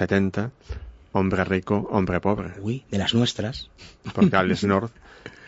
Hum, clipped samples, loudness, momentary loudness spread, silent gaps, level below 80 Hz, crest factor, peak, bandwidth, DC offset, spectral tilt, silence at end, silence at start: none; under 0.1%; -24 LUFS; 19 LU; none; -46 dBFS; 20 dB; -4 dBFS; 8 kHz; under 0.1%; -6 dB/octave; 0 s; 0 s